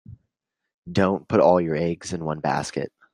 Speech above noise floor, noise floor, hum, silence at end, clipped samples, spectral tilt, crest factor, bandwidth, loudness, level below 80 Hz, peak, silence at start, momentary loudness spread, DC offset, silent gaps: 58 dB; -80 dBFS; none; 0.25 s; under 0.1%; -6.5 dB/octave; 20 dB; 11.5 kHz; -23 LUFS; -58 dBFS; -4 dBFS; 0.1 s; 11 LU; under 0.1%; 0.74-0.83 s